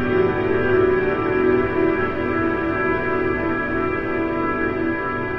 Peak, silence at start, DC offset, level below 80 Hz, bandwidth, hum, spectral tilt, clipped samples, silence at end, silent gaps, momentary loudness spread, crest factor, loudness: -6 dBFS; 0 s; under 0.1%; -40 dBFS; 5.6 kHz; none; -9 dB/octave; under 0.1%; 0 s; none; 4 LU; 14 dB; -20 LUFS